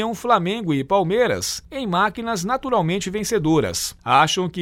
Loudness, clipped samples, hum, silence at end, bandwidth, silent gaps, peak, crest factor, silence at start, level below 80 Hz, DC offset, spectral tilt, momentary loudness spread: -20 LUFS; under 0.1%; none; 0 s; 16.5 kHz; none; -2 dBFS; 18 dB; 0 s; -48 dBFS; under 0.1%; -4.5 dB/octave; 7 LU